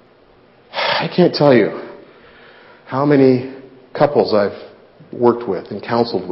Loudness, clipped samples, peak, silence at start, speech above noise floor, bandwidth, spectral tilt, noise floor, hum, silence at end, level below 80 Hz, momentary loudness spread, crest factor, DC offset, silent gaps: -16 LUFS; under 0.1%; 0 dBFS; 0.75 s; 35 dB; 5.8 kHz; -9.5 dB/octave; -49 dBFS; none; 0 s; -58 dBFS; 19 LU; 16 dB; under 0.1%; none